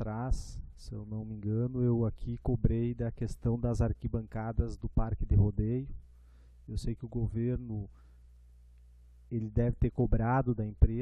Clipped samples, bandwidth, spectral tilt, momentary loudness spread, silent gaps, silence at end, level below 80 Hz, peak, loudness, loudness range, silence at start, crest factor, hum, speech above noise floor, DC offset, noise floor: under 0.1%; 9.8 kHz; -9 dB/octave; 12 LU; none; 0 s; -38 dBFS; -10 dBFS; -33 LUFS; 6 LU; 0 s; 22 dB; 60 Hz at -50 dBFS; 25 dB; under 0.1%; -56 dBFS